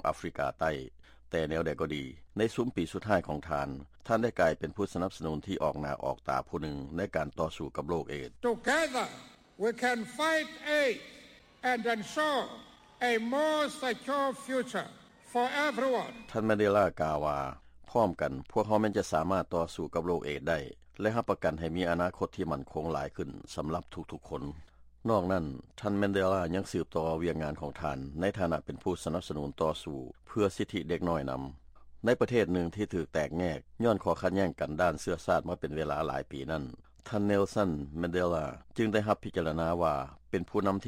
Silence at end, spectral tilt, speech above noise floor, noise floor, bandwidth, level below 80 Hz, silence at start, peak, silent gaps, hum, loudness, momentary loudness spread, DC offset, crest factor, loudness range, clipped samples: 0 s; -6 dB/octave; 23 dB; -55 dBFS; 16.5 kHz; -54 dBFS; 0.05 s; -14 dBFS; none; none; -32 LUFS; 10 LU; under 0.1%; 18 dB; 4 LU; under 0.1%